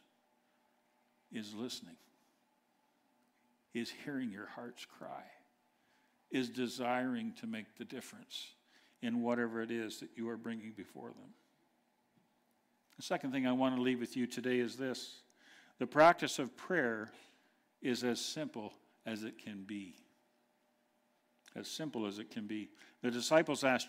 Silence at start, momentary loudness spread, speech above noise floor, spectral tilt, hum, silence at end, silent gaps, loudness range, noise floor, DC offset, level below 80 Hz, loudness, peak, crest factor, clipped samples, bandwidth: 1.3 s; 17 LU; 39 dB; -4 dB/octave; none; 0 s; none; 14 LU; -77 dBFS; under 0.1%; -84 dBFS; -38 LUFS; -14 dBFS; 26 dB; under 0.1%; 16 kHz